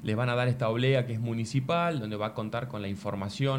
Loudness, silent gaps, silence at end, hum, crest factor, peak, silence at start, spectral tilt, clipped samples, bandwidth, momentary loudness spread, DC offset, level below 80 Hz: -30 LUFS; none; 0 s; none; 14 dB; -14 dBFS; 0 s; -6.5 dB/octave; under 0.1%; 11 kHz; 8 LU; under 0.1%; -62 dBFS